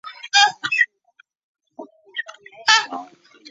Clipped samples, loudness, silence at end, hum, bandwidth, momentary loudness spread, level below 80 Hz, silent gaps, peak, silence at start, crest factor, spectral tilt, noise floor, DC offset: under 0.1%; -17 LUFS; 0.45 s; none; 8.2 kHz; 16 LU; -80 dBFS; 1.44-1.55 s; 0 dBFS; 0.05 s; 22 dB; 2 dB/octave; -58 dBFS; under 0.1%